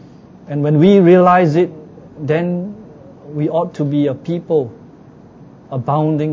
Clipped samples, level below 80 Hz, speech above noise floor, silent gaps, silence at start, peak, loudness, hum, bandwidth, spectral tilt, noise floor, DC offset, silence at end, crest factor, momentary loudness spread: under 0.1%; -54 dBFS; 27 dB; none; 0.5 s; 0 dBFS; -15 LUFS; none; 7.4 kHz; -9 dB/octave; -41 dBFS; under 0.1%; 0 s; 16 dB; 19 LU